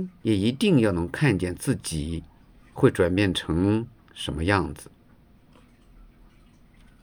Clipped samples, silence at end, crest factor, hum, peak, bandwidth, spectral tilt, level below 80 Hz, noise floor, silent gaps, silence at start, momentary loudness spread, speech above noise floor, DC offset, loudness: under 0.1%; 2.2 s; 20 dB; none; -6 dBFS; over 20 kHz; -6 dB/octave; -48 dBFS; -55 dBFS; none; 0 s; 14 LU; 31 dB; under 0.1%; -24 LUFS